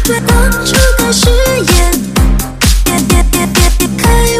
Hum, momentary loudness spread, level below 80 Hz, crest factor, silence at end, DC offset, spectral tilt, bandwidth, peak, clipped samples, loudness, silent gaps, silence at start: none; 3 LU; -12 dBFS; 8 dB; 0 s; under 0.1%; -4 dB/octave; 16 kHz; 0 dBFS; 0.2%; -10 LUFS; none; 0 s